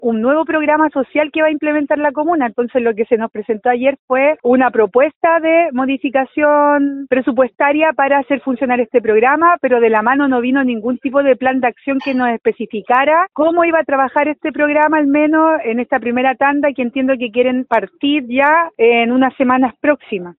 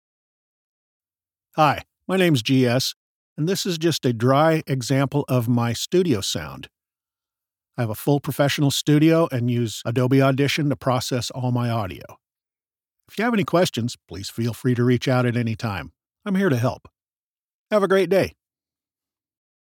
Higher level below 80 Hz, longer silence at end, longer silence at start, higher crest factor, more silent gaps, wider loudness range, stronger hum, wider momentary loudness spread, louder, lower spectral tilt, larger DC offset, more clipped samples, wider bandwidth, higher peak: about the same, -58 dBFS vs -60 dBFS; second, 0.05 s vs 1.45 s; second, 0 s vs 1.55 s; about the same, 14 dB vs 18 dB; second, 3.99-4.08 s, 5.16-5.21 s vs 2.96-3.36 s, 17.19-17.66 s; about the same, 2 LU vs 4 LU; neither; second, 5 LU vs 12 LU; first, -14 LUFS vs -21 LUFS; second, -2.5 dB/octave vs -5.5 dB/octave; neither; neither; second, 4.9 kHz vs 18.5 kHz; first, 0 dBFS vs -4 dBFS